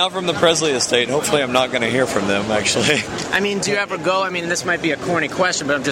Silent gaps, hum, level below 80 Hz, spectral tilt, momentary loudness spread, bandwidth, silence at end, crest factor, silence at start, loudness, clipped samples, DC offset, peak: none; none; -52 dBFS; -3 dB/octave; 4 LU; 16 kHz; 0 s; 16 dB; 0 s; -18 LUFS; under 0.1%; under 0.1%; -2 dBFS